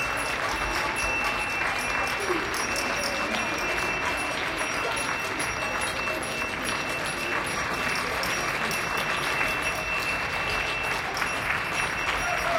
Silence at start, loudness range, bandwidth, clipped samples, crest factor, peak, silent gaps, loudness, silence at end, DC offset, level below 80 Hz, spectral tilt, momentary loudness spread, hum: 0 s; 1 LU; 16.5 kHz; under 0.1%; 18 dB; -10 dBFS; none; -26 LUFS; 0 s; under 0.1%; -46 dBFS; -2.5 dB/octave; 2 LU; none